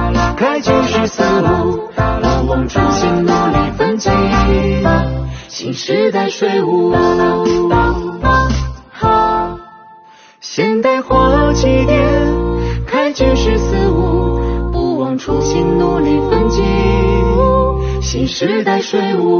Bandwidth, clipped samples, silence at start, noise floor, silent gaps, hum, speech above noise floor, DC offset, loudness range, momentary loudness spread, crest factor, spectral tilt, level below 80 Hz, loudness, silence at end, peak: 6.8 kHz; under 0.1%; 0 s; -42 dBFS; none; none; 29 dB; under 0.1%; 2 LU; 6 LU; 14 dB; -5.5 dB/octave; -22 dBFS; -14 LUFS; 0 s; 0 dBFS